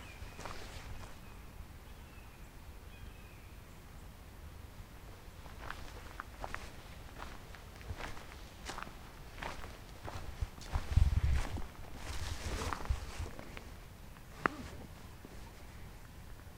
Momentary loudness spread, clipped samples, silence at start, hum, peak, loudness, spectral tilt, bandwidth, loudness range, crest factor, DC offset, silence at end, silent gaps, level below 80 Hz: 16 LU; under 0.1%; 0 s; none; -10 dBFS; -44 LUFS; -5 dB/octave; 16 kHz; 15 LU; 32 dB; under 0.1%; 0 s; none; -44 dBFS